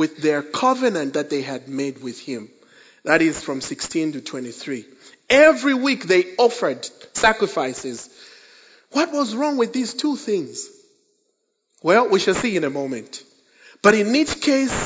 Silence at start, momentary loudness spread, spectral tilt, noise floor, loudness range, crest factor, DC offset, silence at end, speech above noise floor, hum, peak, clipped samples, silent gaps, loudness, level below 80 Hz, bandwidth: 0 s; 16 LU; -4 dB/octave; -71 dBFS; 6 LU; 22 dB; under 0.1%; 0 s; 51 dB; none; 0 dBFS; under 0.1%; none; -20 LUFS; -54 dBFS; 8 kHz